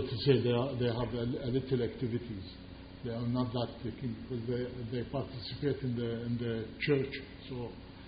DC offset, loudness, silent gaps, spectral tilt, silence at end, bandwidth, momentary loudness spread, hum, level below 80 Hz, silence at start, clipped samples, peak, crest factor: under 0.1%; -35 LUFS; none; -6 dB/octave; 0 s; 5 kHz; 12 LU; none; -54 dBFS; 0 s; under 0.1%; -14 dBFS; 22 dB